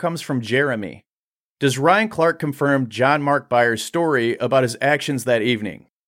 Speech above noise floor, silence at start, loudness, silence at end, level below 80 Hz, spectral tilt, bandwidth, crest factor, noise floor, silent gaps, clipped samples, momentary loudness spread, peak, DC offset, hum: over 71 dB; 0 s; -19 LUFS; 0.3 s; -64 dBFS; -5 dB/octave; 16.5 kHz; 16 dB; under -90 dBFS; 1.08-1.56 s; under 0.1%; 7 LU; -2 dBFS; under 0.1%; none